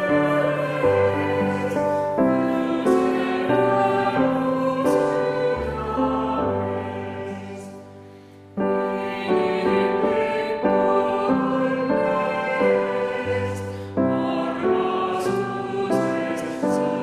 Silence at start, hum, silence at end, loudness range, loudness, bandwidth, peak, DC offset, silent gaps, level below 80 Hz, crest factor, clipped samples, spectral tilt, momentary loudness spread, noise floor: 0 s; none; 0 s; 5 LU; -22 LUFS; 14 kHz; -6 dBFS; under 0.1%; none; -52 dBFS; 16 dB; under 0.1%; -7 dB/octave; 7 LU; -44 dBFS